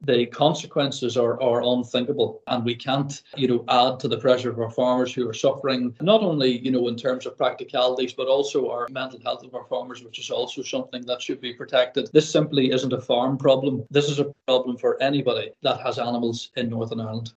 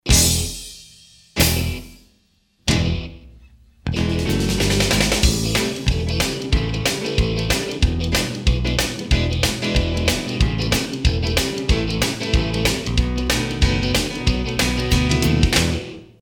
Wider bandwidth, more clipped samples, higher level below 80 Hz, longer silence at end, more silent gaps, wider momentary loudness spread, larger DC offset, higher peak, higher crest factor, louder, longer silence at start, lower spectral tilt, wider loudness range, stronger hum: second, 8.4 kHz vs 19 kHz; neither; second, -70 dBFS vs -26 dBFS; about the same, 0.1 s vs 0.15 s; neither; first, 10 LU vs 7 LU; neither; second, -4 dBFS vs 0 dBFS; about the same, 20 dB vs 18 dB; second, -23 LUFS vs -20 LUFS; about the same, 0 s vs 0.05 s; first, -5.5 dB/octave vs -4 dB/octave; about the same, 4 LU vs 4 LU; neither